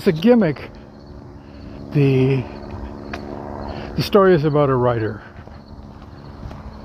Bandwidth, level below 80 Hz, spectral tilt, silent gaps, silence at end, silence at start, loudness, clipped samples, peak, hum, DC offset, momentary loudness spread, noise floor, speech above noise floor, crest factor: 15.5 kHz; -42 dBFS; -8 dB/octave; none; 0 s; 0 s; -18 LUFS; under 0.1%; -2 dBFS; none; under 0.1%; 24 LU; -38 dBFS; 23 dB; 18 dB